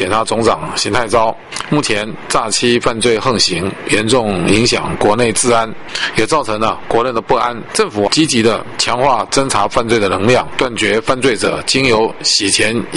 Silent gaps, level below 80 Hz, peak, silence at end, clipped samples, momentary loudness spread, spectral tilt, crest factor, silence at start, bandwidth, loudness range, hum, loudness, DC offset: none; -38 dBFS; 0 dBFS; 0 s; under 0.1%; 5 LU; -3.5 dB/octave; 14 dB; 0 s; 11.5 kHz; 2 LU; none; -14 LUFS; under 0.1%